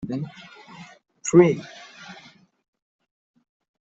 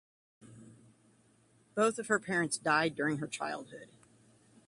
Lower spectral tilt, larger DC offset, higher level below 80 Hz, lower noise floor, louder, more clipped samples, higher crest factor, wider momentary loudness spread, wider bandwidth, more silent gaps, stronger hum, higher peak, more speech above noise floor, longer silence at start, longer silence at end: first, -6.5 dB/octave vs -4 dB/octave; neither; first, -64 dBFS vs -76 dBFS; second, -51 dBFS vs -67 dBFS; first, -20 LUFS vs -33 LUFS; neither; about the same, 22 dB vs 22 dB; first, 27 LU vs 13 LU; second, 8 kHz vs 11.5 kHz; neither; neither; first, -4 dBFS vs -16 dBFS; second, 30 dB vs 34 dB; second, 0 s vs 0.45 s; first, 1.8 s vs 0.85 s